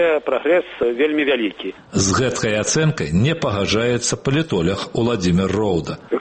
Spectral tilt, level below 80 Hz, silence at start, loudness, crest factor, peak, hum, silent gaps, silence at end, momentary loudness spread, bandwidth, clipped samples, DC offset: -4.5 dB/octave; -44 dBFS; 0 s; -19 LUFS; 14 dB; -6 dBFS; none; none; 0 s; 4 LU; 8.8 kHz; under 0.1%; under 0.1%